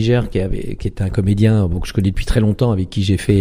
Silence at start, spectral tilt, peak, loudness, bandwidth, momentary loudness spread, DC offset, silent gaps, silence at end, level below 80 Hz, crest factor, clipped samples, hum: 0 s; -7.5 dB/octave; -2 dBFS; -18 LUFS; 14.5 kHz; 8 LU; under 0.1%; none; 0 s; -26 dBFS; 14 dB; under 0.1%; none